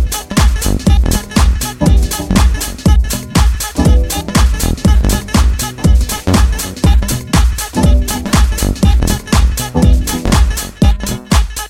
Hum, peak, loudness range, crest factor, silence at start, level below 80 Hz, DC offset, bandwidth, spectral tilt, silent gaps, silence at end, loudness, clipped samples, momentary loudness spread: none; 0 dBFS; 0 LU; 10 dB; 0 s; -12 dBFS; under 0.1%; 16.5 kHz; -5 dB/octave; none; 0 s; -13 LUFS; under 0.1%; 3 LU